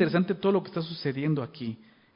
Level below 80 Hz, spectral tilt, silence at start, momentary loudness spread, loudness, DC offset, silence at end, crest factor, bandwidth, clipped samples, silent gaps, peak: -70 dBFS; -11 dB/octave; 0 s; 12 LU; -29 LUFS; under 0.1%; 0.4 s; 18 dB; 5.4 kHz; under 0.1%; none; -10 dBFS